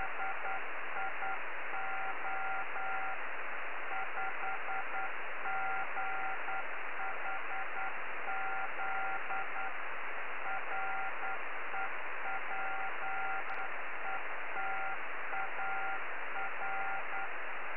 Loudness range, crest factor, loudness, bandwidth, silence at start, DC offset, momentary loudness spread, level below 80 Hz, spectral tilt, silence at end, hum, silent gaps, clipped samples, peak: 1 LU; 14 dB; -38 LUFS; 4.5 kHz; 0 s; 2%; 3 LU; -80 dBFS; -0.5 dB/octave; 0 s; none; none; under 0.1%; -24 dBFS